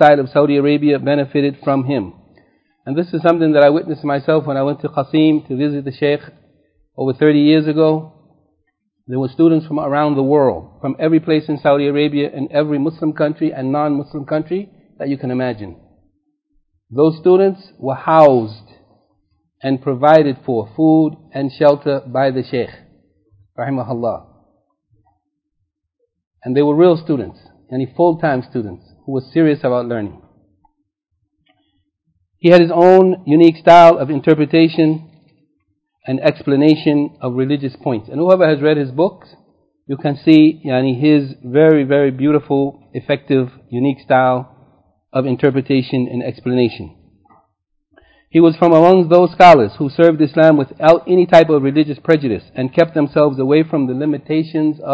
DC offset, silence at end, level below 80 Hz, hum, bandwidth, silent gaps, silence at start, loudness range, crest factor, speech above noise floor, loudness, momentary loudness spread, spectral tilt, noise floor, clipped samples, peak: under 0.1%; 0 s; -54 dBFS; none; 8 kHz; 26.27-26.31 s; 0 s; 9 LU; 14 dB; 58 dB; -14 LUFS; 13 LU; -8.5 dB/octave; -72 dBFS; 0.3%; 0 dBFS